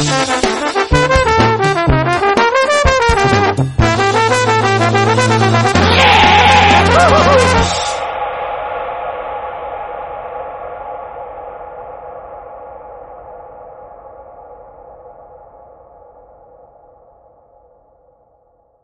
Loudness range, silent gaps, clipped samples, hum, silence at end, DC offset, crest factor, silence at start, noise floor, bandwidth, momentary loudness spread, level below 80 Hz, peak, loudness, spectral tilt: 22 LU; none; under 0.1%; none; 3.7 s; under 0.1%; 14 dB; 0 s; -55 dBFS; 11.5 kHz; 23 LU; -28 dBFS; 0 dBFS; -11 LUFS; -4.5 dB/octave